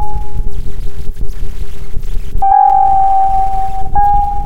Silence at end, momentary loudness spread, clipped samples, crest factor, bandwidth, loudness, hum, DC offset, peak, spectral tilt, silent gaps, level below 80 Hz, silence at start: 0 s; 18 LU; under 0.1%; 12 dB; 4.7 kHz; -12 LUFS; none; 30%; 0 dBFS; -6.5 dB/octave; none; -18 dBFS; 0 s